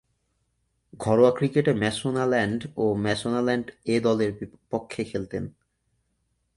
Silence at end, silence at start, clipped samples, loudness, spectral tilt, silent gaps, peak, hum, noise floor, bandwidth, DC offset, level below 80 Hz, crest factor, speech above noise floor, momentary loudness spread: 1.1 s; 0.95 s; under 0.1%; -25 LUFS; -6 dB/octave; none; -6 dBFS; none; -73 dBFS; 11.5 kHz; under 0.1%; -56 dBFS; 20 dB; 49 dB; 13 LU